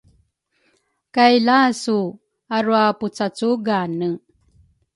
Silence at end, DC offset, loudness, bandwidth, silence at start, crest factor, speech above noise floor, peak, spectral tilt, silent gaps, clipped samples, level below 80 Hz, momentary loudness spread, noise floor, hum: 0.8 s; under 0.1%; -19 LUFS; 11.5 kHz; 1.15 s; 18 dB; 48 dB; -2 dBFS; -5 dB/octave; none; under 0.1%; -64 dBFS; 11 LU; -66 dBFS; none